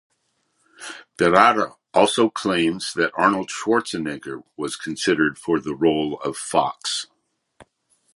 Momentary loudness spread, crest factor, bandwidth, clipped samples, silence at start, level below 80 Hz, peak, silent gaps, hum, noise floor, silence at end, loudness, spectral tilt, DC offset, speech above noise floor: 15 LU; 22 dB; 11.5 kHz; under 0.1%; 0.8 s; -58 dBFS; 0 dBFS; none; none; -70 dBFS; 0.55 s; -21 LUFS; -4 dB/octave; under 0.1%; 49 dB